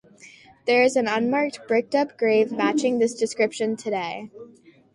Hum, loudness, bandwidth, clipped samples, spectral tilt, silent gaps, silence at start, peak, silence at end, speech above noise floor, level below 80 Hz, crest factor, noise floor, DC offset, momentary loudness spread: none; -23 LUFS; 11.5 kHz; under 0.1%; -4 dB/octave; none; 0.25 s; -6 dBFS; 0.45 s; 27 dB; -70 dBFS; 18 dB; -49 dBFS; under 0.1%; 9 LU